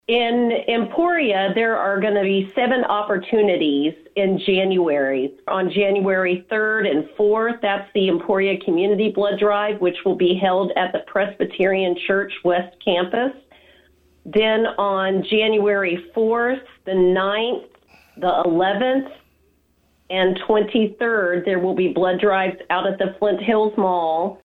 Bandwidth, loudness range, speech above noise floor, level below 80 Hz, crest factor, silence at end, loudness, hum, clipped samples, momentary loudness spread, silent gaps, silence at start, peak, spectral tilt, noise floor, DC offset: 4.4 kHz; 2 LU; 42 dB; -60 dBFS; 14 dB; 0.1 s; -20 LUFS; none; under 0.1%; 5 LU; none; 0.1 s; -6 dBFS; -8 dB/octave; -61 dBFS; under 0.1%